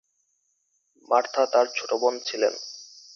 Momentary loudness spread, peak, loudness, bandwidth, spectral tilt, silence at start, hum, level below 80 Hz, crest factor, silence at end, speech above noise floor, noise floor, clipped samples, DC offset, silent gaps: 15 LU; -6 dBFS; -24 LUFS; 7.4 kHz; -1 dB/octave; 1.1 s; none; -82 dBFS; 20 dB; 0.3 s; 49 dB; -72 dBFS; under 0.1%; under 0.1%; none